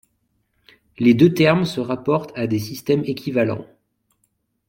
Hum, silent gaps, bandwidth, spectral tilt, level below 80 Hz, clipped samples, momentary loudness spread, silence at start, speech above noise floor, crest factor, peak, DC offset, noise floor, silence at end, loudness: none; none; 16.5 kHz; -7 dB/octave; -58 dBFS; under 0.1%; 10 LU; 1 s; 51 dB; 18 dB; -2 dBFS; under 0.1%; -69 dBFS; 1.05 s; -19 LUFS